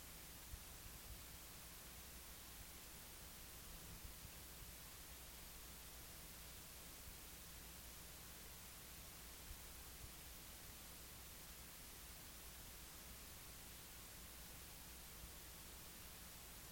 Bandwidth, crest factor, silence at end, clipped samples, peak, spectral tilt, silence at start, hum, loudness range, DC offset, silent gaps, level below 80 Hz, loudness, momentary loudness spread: 17 kHz; 18 dB; 0 s; under 0.1%; -40 dBFS; -2 dB/octave; 0 s; none; 0 LU; under 0.1%; none; -64 dBFS; -55 LUFS; 0 LU